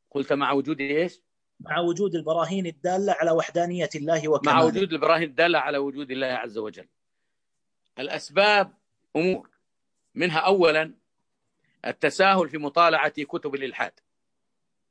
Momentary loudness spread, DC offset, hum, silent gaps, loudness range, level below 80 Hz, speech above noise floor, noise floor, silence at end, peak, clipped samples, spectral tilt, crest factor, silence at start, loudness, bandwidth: 12 LU; under 0.1%; none; none; 4 LU; -72 dBFS; 61 dB; -85 dBFS; 1 s; -6 dBFS; under 0.1%; -5 dB/octave; 20 dB; 0.15 s; -24 LUFS; 10.5 kHz